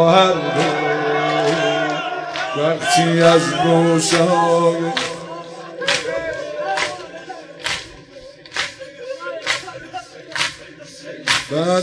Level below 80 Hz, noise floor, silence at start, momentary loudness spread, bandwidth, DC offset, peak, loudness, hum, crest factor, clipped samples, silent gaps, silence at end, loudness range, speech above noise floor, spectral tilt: -56 dBFS; -40 dBFS; 0 s; 19 LU; 11 kHz; under 0.1%; -2 dBFS; -18 LUFS; none; 18 dB; under 0.1%; none; 0 s; 10 LU; 25 dB; -4 dB/octave